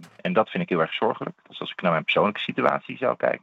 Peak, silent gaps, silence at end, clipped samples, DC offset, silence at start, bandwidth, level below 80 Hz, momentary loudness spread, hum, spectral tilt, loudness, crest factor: -4 dBFS; none; 0.05 s; under 0.1%; under 0.1%; 0 s; 7.8 kHz; -76 dBFS; 11 LU; none; -7 dB/octave; -24 LUFS; 22 dB